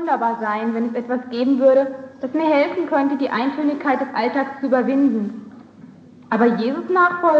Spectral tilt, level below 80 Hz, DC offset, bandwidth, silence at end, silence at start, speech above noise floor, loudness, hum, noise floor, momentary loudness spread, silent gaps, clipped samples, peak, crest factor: -7.5 dB/octave; -74 dBFS; under 0.1%; 6.8 kHz; 0 s; 0 s; 25 dB; -19 LUFS; none; -43 dBFS; 9 LU; none; under 0.1%; -4 dBFS; 14 dB